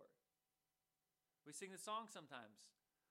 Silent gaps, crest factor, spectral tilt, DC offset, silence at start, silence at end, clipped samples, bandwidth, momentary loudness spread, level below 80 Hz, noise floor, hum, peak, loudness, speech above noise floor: none; 22 dB; -2.5 dB/octave; under 0.1%; 0 s; 0.4 s; under 0.1%; 16 kHz; 18 LU; under -90 dBFS; under -90 dBFS; none; -36 dBFS; -53 LUFS; over 36 dB